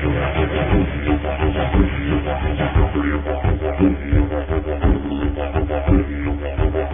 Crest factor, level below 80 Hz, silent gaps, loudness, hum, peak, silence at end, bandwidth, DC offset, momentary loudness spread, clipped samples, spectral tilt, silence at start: 16 dB; -22 dBFS; none; -20 LUFS; none; -2 dBFS; 0 s; 3.7 kHz; 0.7%; 4 LU; under 0.1%; -12.5 dB/octave; 0 s